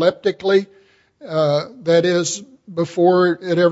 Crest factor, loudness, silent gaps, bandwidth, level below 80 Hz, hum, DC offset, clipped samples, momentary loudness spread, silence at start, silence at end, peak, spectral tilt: 16 dB; -18 LUFS; none; 8 kHz; -66 dBFS; none; under 0.1%; under 0.1%; 10 LU; 0 s; 0 s; -2 dBFS; -5 dB/octave